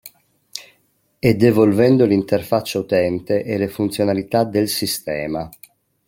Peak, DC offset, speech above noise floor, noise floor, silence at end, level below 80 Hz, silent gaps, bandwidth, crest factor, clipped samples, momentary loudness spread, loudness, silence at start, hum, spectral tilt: -2 dBFS; under 0.1%; 45 dB; -62 dBFS; 0.6 s; -52 dBFS; none; 17 kHz; 16 dB; under 0.1%; 15 LU; -18 LUFS; 0.05 s; none; -6 dB/octave